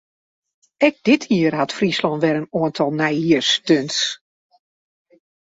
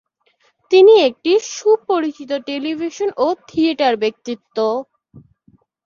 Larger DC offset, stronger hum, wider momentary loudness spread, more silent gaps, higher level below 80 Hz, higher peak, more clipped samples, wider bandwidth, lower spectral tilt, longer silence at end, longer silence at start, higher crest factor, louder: neither; neither; second, 5 LU vs 13 LU; neither; about the same, -62 dBFS vs -62 dBFS; about the same, -2 dBFS vs -2 dBFS; neither; about the same, 8 kHz vs 7.4 kHz; about the same, -4.5 dB/octave vs -3.5 dB/octave; first, 1.25 s vs 0.65 s; about the same, 0.8 s vs 0.7 s; about the same, 18 dB vs 16 dB; about the same, -18 LUFS vs -16 LUFS